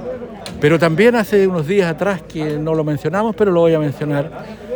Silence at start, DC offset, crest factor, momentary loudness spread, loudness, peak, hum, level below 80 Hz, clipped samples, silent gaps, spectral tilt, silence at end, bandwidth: 0 s; under 0.1%; 14 dB; 13 LU; -16 LUFS; -2 dBFS; none; -46 dBFS; under 0.1%; none; -7 dB/octave; 0 s; over 20 kHz